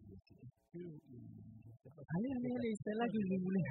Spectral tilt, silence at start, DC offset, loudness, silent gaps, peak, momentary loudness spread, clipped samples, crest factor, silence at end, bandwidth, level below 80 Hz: -7.5 dB/octave; 0 s; under 0.1%; -40 LUFS; none; -26 dBFS; 22 LU; under 0.1%; 14 dB; 0 s; 4.3 kHz; -72 dBFS